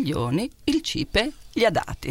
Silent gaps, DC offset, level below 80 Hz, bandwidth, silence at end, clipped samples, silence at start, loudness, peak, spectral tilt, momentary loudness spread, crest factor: none; under 0.1%; -40 dBFS; 16.5 kHz; 0 s; under 0.1%; 0 s; -24 LUFS; -6 dBFS; -5 dB/octave; 5 LU; 18 dB